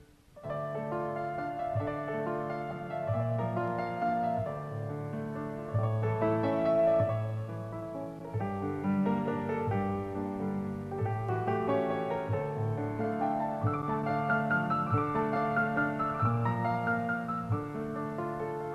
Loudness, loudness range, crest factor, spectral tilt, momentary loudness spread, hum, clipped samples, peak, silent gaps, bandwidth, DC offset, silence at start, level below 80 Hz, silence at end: -32 LUFS; 4 LU; 16 dB; -9 dB/octave; 8 LU; none; under 0.1%; -16 dBFS; none; 9.8 kHz; under 0.1%; 0 s; -60 dBFS; 0 s